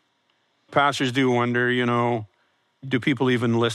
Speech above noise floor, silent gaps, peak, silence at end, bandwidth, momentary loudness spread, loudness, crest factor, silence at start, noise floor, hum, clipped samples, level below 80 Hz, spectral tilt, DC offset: 47 dB; none; -4 dBFS; 0 s; 12.5 kHz; 6 LU; -22 LUFS; 18 dB; 0.7 s; -68 dBFS; none; under 0.1%; -70 dBFS; -6 dB/octave; under 0.1%